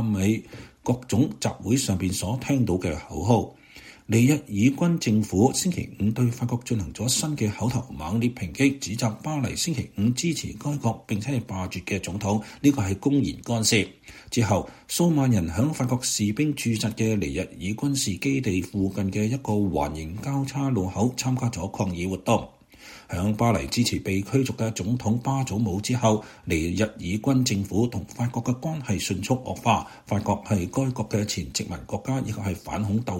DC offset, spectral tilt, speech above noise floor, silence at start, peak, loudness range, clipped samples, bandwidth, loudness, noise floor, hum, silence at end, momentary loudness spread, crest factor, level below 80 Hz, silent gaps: under 0.1%; -5.5 dB/octave; 23 dB; 0 s; -6 dBFS; 3 LU; under 0.1%; 16.5 kHz; -25 LUFS; -48 dBFS; none; 0 s; 8 LU; 20 dB; -48 dBFS; none